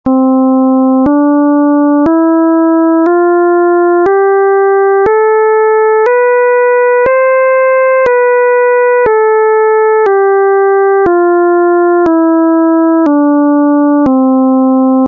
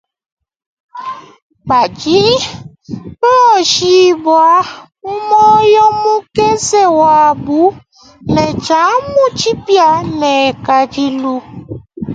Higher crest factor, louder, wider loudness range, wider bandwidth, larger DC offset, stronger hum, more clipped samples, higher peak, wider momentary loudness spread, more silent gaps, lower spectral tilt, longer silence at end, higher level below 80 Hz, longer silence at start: second, 6 dB vs 12 dB; about the same, -8 LUFS vs -10 LUFS; second, 0 LU vs 4 LU; second, 3.3 kHz vs 9.4 kHz; neither; neither; neither; about the same, -2 dBFS vs 0 dBFS; second, 0 LU vs 19 LU; second, none vs 1.42-1.50 s; first, -9 dB/octave vs -4 dB/octave; about the same, 0 s vs 0 s; about the same, -48 dBFS vs -44 dBFS; second, 0.05 s vs 0.95 s